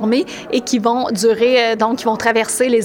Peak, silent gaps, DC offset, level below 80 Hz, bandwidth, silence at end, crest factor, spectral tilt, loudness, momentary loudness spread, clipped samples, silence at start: -2 dBFS; none; under 0.1%; -56 dBFS; 17.5 kHz; 0 s; 14 dB; -3.5 dB/octave; -16 LUFS; 5 LU; under 0.1%; 0 s